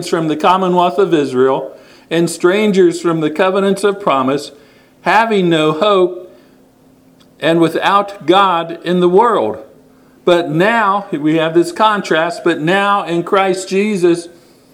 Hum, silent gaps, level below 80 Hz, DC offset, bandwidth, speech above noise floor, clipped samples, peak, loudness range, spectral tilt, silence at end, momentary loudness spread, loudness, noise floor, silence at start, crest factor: none; none; -60 dBFS; under 0.1%; 14 kHz; 34 dB; under 0.1%; 0 dBFS; 2 LU; -5.5 dB/octave; 0.45 s; 7 LU; -13 LUFS; -47 dBFS; 0 s; 14 dB